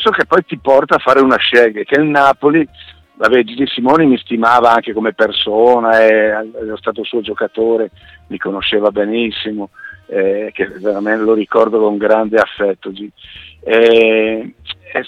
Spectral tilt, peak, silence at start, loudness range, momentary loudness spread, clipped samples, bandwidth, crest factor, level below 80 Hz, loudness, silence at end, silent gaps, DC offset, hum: -6 dB/octave; 0 dBFS; 0 s; 6 LU; 14 LU; 0.2%; 10 kHz; 14 dB; -50 dBFS; -13 LUFS; 0 s; none; under 0.1%; none